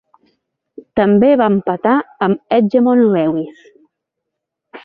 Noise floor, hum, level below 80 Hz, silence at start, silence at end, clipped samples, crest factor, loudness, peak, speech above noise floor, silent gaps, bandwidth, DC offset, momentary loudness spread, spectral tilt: -78 dBFS; none; -56 dBFS; 0.95 s; 0.05 s; under 0.1%; 14 dB; -14 LUFS; -2 dBFS; 65 dB; none; 5 kHz; under 0.1%; 8 LU; -10 dB/octave